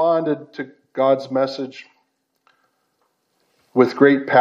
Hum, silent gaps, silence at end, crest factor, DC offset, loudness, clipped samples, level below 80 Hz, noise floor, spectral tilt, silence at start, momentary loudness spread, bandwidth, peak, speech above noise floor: none; none; 0 s; 20 dB; under 0.1%; -19 LUFS; under 0.1%; -78 dBFS; -69 dBFS; -7 dB/octave; 0 s; 19 LU; 7.2 kHz; 0 dBFS; 51 dB